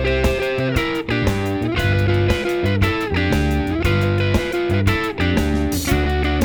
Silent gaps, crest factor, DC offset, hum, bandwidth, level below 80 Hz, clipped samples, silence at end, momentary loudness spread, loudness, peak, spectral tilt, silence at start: none; 14 dB; under 0.1%; none; over 20 kHz; -26 dBFS; under 0.1%; 0 s; 2 LU; -19 LUFS; -4 dBFS; -6 dB/octave; 0 s